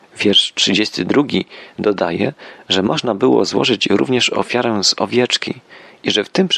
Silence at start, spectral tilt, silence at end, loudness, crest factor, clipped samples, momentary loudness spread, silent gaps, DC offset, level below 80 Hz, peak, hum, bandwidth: 0.15 s; -3.5 dB/octave; 0 s; -16 LUFS; 14 dB; under 0.1%; 8 LU; none; under 0.1%; -58 dBFS; -2 dBFS; none; 12 kHz